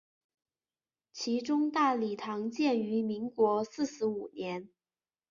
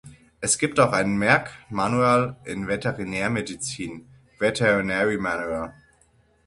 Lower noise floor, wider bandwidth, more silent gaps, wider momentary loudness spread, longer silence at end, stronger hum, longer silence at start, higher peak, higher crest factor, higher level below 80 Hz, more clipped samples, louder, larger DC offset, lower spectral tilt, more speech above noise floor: first, under -90 dBFS vs -61 dBFS; second, 7.4 kHz vs 11.5 kHz; neither; about the same, 10 LU vs 12 LU; about the same, 0.65 s vs 0.75 s; neither; first, 1.15 s vs 0.05 s; second, -16 dBFS vs -2 dBFS; about the same, 18 dB vs 22 dB; second, -76 dBFS vs -52 dBFS; neither; second, -32 LUFS vs -23 LUFS; neither; about the same, -5 dB/octave vs -4.5 dB/octave; first, over 59 dB vs 38 dB